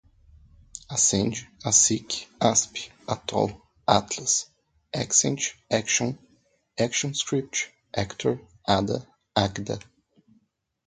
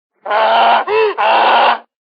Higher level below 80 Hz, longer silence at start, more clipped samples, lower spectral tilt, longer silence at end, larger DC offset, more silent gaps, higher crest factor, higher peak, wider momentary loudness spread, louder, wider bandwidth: first, -54 dBFS vs -76 dBFS; first, 0.75 s vs 0.25 s; neither; about the same, -3 dB/octave vs -3.5 dB/octave; first, 1.05 s vs 0.35 s; neither; neither; first, 26 dB vs 12 dB; about the same, -2 dBFS vs 0 dBFS; first, 12 LU vs 6 LU; second, -25 LUFS vs -12 LUFS; first, 10.5 kHz vs 6.4 kHz